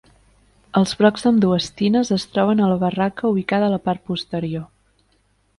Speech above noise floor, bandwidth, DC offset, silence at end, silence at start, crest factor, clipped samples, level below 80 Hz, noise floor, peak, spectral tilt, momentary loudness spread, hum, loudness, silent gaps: 44 dB; 11.5 kHz; under 0.1%; 0.95 s; 0.75 s; 18 dB; under 0.1%; -54 dBFS; -62 dBFS; -2 dBFS; -6.5 dB/octave; 9 LU; 50 Hz at -40 dBFS; -19 LUFS; none